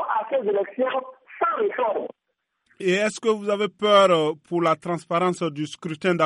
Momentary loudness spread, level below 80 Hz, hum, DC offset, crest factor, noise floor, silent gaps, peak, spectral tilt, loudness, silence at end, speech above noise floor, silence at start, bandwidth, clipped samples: 12 LU; -74 dBFS; none; under 0.1%; 18 dB; -75 dBFS; none; -4 dBFS; -5 dB/octave; -23 LUFS; 0 s; 53 dB; 0 s; 11.5 kHz; under 0.1%